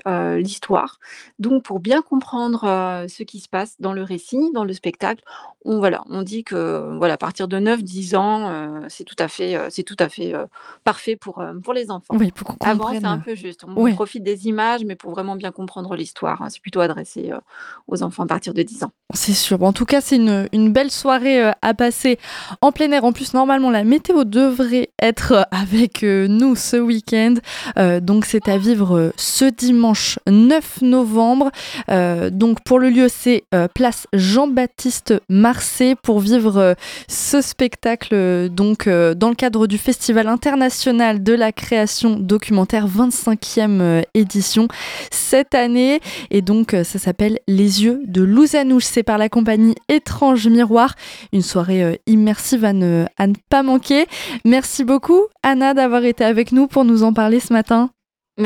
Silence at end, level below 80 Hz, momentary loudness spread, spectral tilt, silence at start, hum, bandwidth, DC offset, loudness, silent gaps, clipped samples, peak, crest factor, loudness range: 0 s; -46 dBFS; 12 LU; -5 dB/octave; 0.05 s; none; 17 kHz; under 0.1%; -16 LUFS; none; under 0.1%; 0 dBFS; 16 dB; 8 LU